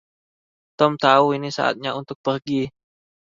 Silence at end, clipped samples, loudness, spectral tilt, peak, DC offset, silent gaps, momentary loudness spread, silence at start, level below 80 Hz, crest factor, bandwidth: 0.55 s; under 0.1%; -21 LUFS; -5.5 dB/octave; 0 dBFS; under 0.1%; 2.15-2.24 s; 11 LU; 0.8 s; -62 dBFS; 22 dB; 7.6 kHz